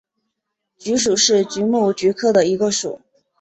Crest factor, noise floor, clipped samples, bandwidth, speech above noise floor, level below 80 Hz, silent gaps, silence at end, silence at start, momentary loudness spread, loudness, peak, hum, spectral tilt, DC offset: 16 dB; -78 dBFS; under 0.1%; 8.4 kHz; 60 dB; -58 dBFS; none; 0.45 s; 0.8 s; 12 LU; -17 LUFS; -4 dBFS; none; -3 dB/octave; under 0.1%